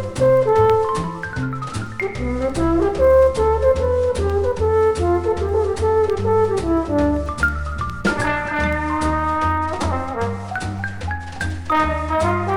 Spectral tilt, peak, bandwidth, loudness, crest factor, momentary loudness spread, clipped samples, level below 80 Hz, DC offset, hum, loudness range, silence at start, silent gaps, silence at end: -6.5 dB/octave; -4 dBFS; 15.5 kHz; -19 LUFS; 14 dB; 11 LU; under 0.1%; -30 dBFS; under 0.1%; none; 5 LU; 0 s; none; 0 s